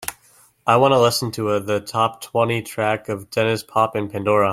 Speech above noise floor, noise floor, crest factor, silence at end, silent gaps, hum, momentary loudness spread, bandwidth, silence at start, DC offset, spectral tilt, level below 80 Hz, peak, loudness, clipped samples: 35 dB; -54 dBFS; 18 dB; 0 s; none; none; 9 LU; 16.5 kHz; 0 s; under 0.1%; -5 dB/octave; -58 dBFS; -2 dBFS; -20 LUFS; under 0.1%